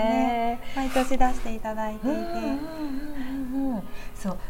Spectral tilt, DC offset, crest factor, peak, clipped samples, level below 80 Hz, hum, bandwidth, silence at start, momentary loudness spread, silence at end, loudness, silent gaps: -5.5 dB/octave; under 0.1%; 18 dB; -6 dBFS; under 0.1%; -36 dBFS; none; 16 kHz; 0 s; 10 LU; 0 s; -29 LUFS; none